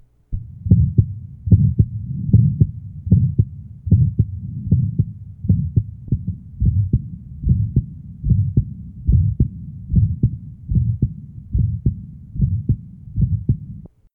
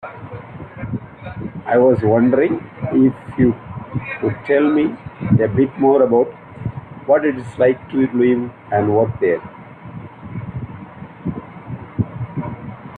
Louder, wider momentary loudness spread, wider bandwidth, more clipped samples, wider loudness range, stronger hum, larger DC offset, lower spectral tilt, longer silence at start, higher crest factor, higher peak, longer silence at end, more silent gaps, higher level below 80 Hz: about the same, -20 LUFS vs -18 LUFS; second, 16 LU vs 19 LU; second, 0.8 kHz vs 4.5 kHz; neither; second, 4 LU vs 7 LU; neither; neither; first, -16 dB/octave vs -10 dB/octave; first, 0.3 s vs 0.05 s; about the same, 18 dB vs 16 dB; about the same, 0 dBFS vs -2 dBFS; first, 0.25 s vs 0 s; neither; first, -28 dBFS vs -48 dBFS